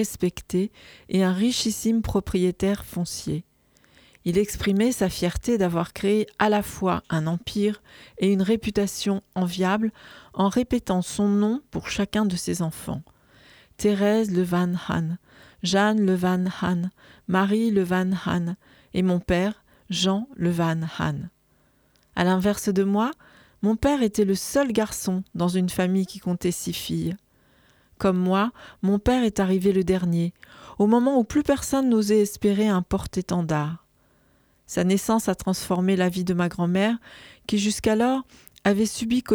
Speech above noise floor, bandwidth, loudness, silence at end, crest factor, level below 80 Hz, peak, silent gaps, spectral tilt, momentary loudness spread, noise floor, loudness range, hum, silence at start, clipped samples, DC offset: 40 dB; over 20 kHz; -24 LUFS; 0 s; 18 dB; -46 dBFS; -6 dBFS; none; -5.5 dB/octave; 8 LU; -63 dBFS; 4 LU; none; 0 s; under 0.1%; under 0.1%